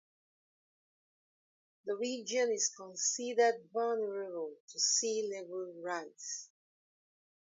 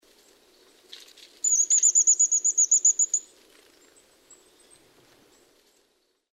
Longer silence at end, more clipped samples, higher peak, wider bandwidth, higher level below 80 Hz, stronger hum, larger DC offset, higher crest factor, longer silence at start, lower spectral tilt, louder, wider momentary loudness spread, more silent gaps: second, 0.95 s vs 3.1 s; neither; second, -18 dBFS vs -10 dBFS; second, 7.6 kHz vs 15.5 kHz; second, under -90 dBFS vs -80 dBFS; neither; neither; about the same, 20 dB vs 18 dB; first, 1.85 s vs 1.45 s; first, -0.5 dB/octave vs 3.5 dB/octave; second, -35 LUFS vs -19 LUFS; first, 12 LU vs 7 LU; first, 4.60-4.68 s vs none